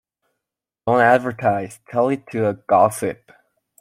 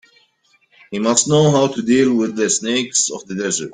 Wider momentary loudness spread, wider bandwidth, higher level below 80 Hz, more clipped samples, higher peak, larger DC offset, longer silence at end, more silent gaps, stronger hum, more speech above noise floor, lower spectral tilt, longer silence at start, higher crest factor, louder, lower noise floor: first, 12 LU vs 8 LU; first, 15.5 kHz vs 9.8 kHz; about the same, -62 dBFS vs -58 dBFS; neither; about the same, -2 dBFS vs 0 dBFS; neither; first, 0.65 s vs 0 s; neither; neither; first, 65 dB vs 43 dB; first, -6 dB/octave vs -4 dB/octave; about the same, 0.85 s vs 0.9 s; about the same, 18 dB vs 18 dB; second, -19 LUFS vs -16 LUFS; first, -84 dBFS vs -59 dBFS